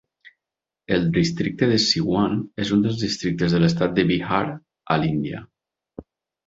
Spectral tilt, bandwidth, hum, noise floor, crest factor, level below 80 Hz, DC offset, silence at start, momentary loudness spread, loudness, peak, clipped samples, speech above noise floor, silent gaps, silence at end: -5.5 dB/octave; 7.8 kHz; none; -87 dBFS; 20 dB; -50 dBFS; under 0.1%; 0.9 s; 7 LU; -21 LUFS; -4 dBFS; under 0.1%; 66 dB; none; 0.45 s